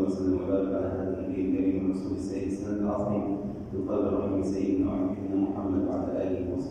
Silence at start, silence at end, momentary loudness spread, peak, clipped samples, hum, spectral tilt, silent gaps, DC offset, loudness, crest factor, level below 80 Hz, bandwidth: 0 s; 0 s; 5 LU; -16 dBFS; under 0.1%; none; -9 dB/octave; none; under 0.1%; -29 LUFS; 14 dB; -50 dBFS; 9.2 kHz